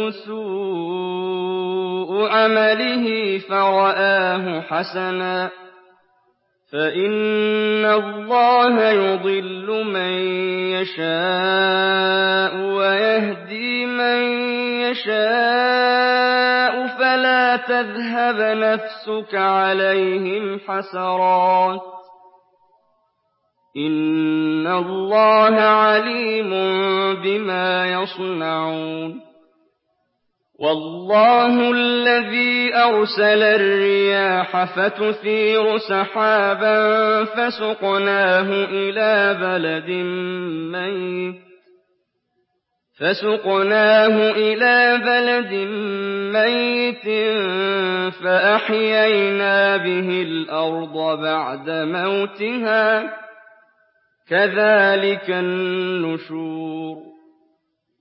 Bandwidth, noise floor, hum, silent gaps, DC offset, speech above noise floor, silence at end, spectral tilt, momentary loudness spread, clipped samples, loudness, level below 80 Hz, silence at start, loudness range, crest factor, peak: 5.8 kHz; -73 dBFS; none; none; under 0.1%; 55 dB; 0.9 s; -9.5 dB/octave; 10 LU; under 0.1%; -18 LUFS; -80 dBFS; 0 s; 6 LU; 16 dB; -4 dBFS